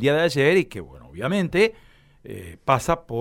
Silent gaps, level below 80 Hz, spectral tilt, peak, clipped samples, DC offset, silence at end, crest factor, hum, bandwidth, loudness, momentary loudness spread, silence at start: none; -48 dBFS; -5.5 dB/octave; -4 dBFS; under 0.1%; under 0.1%; 0 s; 18 dB; none; 16.5 kHz; -22 LUFS; 19 LU; 0 s